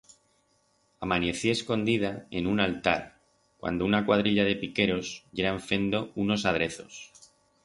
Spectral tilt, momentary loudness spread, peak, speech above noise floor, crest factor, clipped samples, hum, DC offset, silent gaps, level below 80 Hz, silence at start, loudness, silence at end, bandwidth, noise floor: -5 dB/octave; 13 LU; -6 dBFS; 41 dB; 22 dB; under 0.1%; none; under 0.1%; none; -54 dBFS; 1 s; -28 LUFS; 0.6 s; 11.5 kHz; -69 dBFS